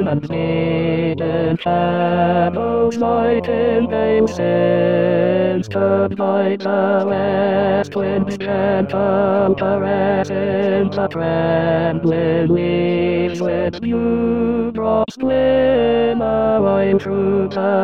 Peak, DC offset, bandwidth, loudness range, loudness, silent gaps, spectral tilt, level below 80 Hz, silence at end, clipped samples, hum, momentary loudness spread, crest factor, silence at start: -2 dBFS; 0.5%; 7.8 kHz; 1 LU; -17 LUFS; none; -8 dB/octave; -46 dBFS; 0 s; under 0.1%; none; 4 LU; 14 dB; 0 s